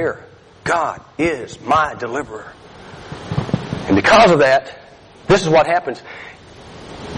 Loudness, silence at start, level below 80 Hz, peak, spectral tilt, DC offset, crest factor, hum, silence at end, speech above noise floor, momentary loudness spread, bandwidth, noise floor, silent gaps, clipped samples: -16 LUFS; 0 s; -44 dBFS; -2 dBFS; -5 dB/octave; under 0.1%; 16 dB; none; 0 s; 26 dB; 25 LU; 11 kHz; -42 dBFS; none; under 0.1%